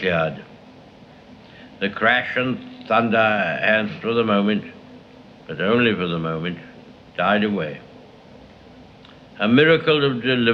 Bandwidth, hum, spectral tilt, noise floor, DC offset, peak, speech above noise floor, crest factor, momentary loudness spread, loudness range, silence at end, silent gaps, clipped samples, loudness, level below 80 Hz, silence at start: 6.6 kHz; none; -7.5 dB/octave; -46 dBFS; under 0.1%; -2 dBFS; 26 dB; 20 dB; 14 LU; 4 LU; 0 s; none; under 0.1%; -20 LUFS; -58 dBFS; 0 s